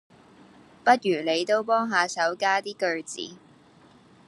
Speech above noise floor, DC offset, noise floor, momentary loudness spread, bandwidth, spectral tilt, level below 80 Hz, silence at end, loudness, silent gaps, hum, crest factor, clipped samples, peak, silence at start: 30 dB; under 0.1%; -55 dBFS; 11 LU; 12 kHz; -3 dB/octave; -78 dBFS; 0.95 s; -24 LUFS; none; none; 22 dB; under 0.1%; -6 dBFS; 0.85 s